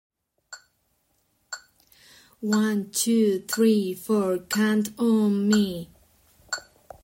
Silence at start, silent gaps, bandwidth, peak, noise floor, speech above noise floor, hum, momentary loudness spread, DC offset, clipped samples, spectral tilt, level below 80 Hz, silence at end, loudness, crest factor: 0.5 s; none; 16.5 kHz; -10 dBFS; -70 dBFS; 48 dB; none; 19 LU; under 0.1%; under 0.1%; -4.5 dB/octave; -64 dBFS; 0.45 s; -24 LUFS; 16 dB